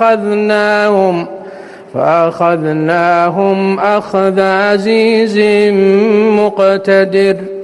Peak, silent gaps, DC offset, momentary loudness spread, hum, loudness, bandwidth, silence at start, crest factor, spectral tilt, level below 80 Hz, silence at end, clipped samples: 0 dBFS; none; under 0.1%; 5 LU; none; -11 LUFS; 11.5 kHz; 0 s; 10 dB; -6.5 dB/octave; -56 dBFS; 0 s; under 0.1%